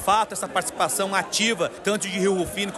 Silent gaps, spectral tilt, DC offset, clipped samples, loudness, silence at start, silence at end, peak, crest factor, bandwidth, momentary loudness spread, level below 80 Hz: none; -2.5 dB/octave; under 0.1%; under 0.1%; -23 LUFS; 0 s; 0 s; -8 dBFS; 16 dB; 13 kHz; 4 LU; -54 dBFS